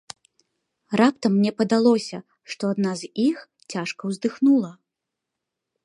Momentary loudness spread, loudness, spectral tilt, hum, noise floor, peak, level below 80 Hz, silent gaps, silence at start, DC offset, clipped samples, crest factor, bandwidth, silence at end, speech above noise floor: 16 LU; -22 LUFS; -6 dB/octave; none; -84 dBFS; -4 dBFS; -72 dBFS; none; 0.9 s; under 0.1%; under 0.1%; 20 dB; 11 kHz; 1.15 s; 62 dB